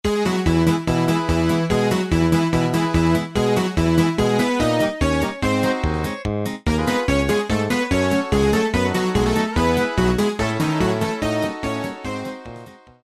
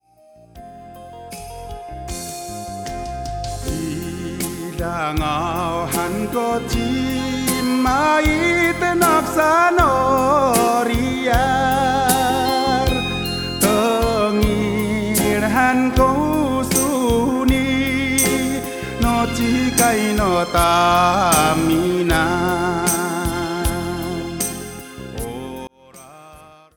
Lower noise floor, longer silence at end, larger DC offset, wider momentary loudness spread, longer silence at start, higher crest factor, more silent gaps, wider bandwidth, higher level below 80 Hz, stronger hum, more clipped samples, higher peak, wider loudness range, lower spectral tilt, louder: second, -41 dBFS vs -49 dBFS; about the same, 0.3 s vs 0.3 s; first, 0.1% vs under 0.1%; second, 7 LU vs 14 LU; second, 0.05 s vs 0.55 s; about the same, 16 dB vs 18 dB; neither; second, 13.5 kHz vs over 20 kHz; about the same, -32 dBFS vs -32 dBFS; neither; neither; about the same, -4 dBFS vs -2 dBFS; second, 2 LU vs 10 LU; first, -6 dB/octave vs -4 dB/octave; about the same, -20 LUFS vs -18 LUFS